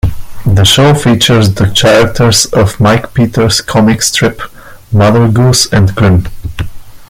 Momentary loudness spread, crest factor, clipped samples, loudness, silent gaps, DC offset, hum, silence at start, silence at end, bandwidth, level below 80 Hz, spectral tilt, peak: 13 LU; 8 dB; 0.1%; -8 LUFS; none; under 0.1%; none; 0.05 s; 0.05 s; 16.5 kHz; -26 dBFS; -4.5 dB/octave; 0 dBFS